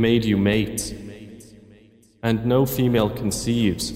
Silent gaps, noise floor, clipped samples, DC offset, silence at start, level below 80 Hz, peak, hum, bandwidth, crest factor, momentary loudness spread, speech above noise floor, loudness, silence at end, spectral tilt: none; -53 dBFS; under 0.1%; under 0.1%; 0 s; -44 dBFS; -6 dBFS; none; 16 kHz; 16 dB; 18 LU; 32 dB; -22 LUFS; 0 s; -5.5 dB/octave